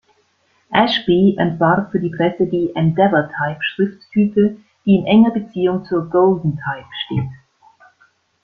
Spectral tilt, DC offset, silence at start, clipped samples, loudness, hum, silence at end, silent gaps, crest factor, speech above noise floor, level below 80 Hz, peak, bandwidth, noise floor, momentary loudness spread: -8.5 dB/octave; under 0.1%; 0.7 s; under 0.1%; -17 LUFS; none; 1.05 s; none; 16 dB; 45 dB; -52 dBFS; -2 dBFS; 6.2 kHz; -61 dBFS; 10 LU